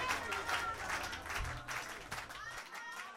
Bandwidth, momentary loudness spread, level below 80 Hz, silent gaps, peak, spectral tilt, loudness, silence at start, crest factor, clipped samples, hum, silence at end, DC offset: 16 kHz; 9 LU; -54 dBFS; none; -22 dBFS; -2 dB/octave; -40 LUFS; 0 s; 20 dB; under 0.1%; none; 0 s; under 0.1%